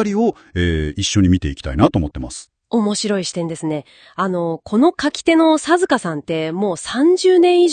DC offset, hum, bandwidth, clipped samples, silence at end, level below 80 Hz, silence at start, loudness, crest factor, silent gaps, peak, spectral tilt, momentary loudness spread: under 0.1%; none; 10 kHz; under 0.1%; 0 s; -38 dBFS; 0 s; -17 LUFS; 16 dB; none; 0 dBFS; -5.5 dB/octave; 11 LU